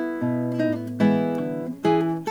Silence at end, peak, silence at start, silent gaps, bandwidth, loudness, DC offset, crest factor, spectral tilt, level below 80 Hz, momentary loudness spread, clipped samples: 0 s; -8 dBFS; 0 s; none; 19 kHz; -24 LUFS; under 0.1%; 16 dB; -8 dB/octave; -70 dBFS; 5 LU; under 0.1%